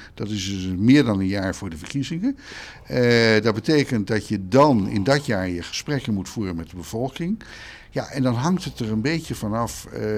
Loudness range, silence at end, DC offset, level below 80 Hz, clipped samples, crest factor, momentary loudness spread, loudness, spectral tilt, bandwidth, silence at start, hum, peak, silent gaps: 6 LU; 0 s; under 0.1%; -48 dBFS; under 0.1%; 18 dB; 14 LU; -22 LUFS; -6 dB/octave; 15 kHz; 0 s; none; -4 dBFS; none